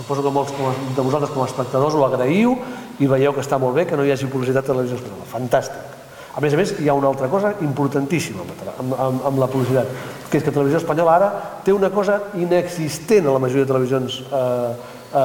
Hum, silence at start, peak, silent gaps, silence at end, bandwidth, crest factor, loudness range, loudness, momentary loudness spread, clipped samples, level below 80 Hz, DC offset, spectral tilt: none; 0 s; -2 dBFS; none; 0 s; 18.5 kHz; 16 dB; 3 LU; -19 LUFS; 10 LU; under 0.1%; -56 dBFS; under 0.1%; -6.5 dB/octave